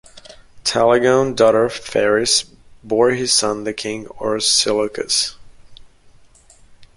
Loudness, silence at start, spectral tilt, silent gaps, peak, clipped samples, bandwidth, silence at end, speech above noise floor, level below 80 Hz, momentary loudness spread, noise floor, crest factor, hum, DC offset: -17 LUFS; 0.15 s; -2.5 dB/octave; none; -2 dBFS; under 0.1%; 11.5 kHz; 0.1 s; 31 dB; -50 dBFS; 10 LU; -48 dBFS; 18 dB; none; under 0.1%